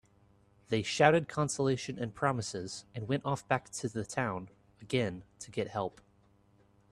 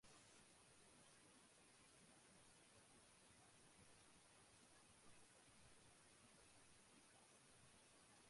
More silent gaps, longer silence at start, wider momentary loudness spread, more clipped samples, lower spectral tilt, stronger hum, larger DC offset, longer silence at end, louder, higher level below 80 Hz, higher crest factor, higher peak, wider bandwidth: neither; first, 0.7 s vs 0 s; first, 15 LU vs 1 LU; neither; first, -5 dB/octave vs -2.5 dB/octave; neither; neither; first, 1 s vs 0 s; first, -33 LUFS vs -69 LUFS; first, -66 dBFS vs -88 dBFS; first, 26 dB vs 16 dB; first, -8 dBFS vs -54 dBFS; about the same, 12.5 kHz vs 11.5 kHz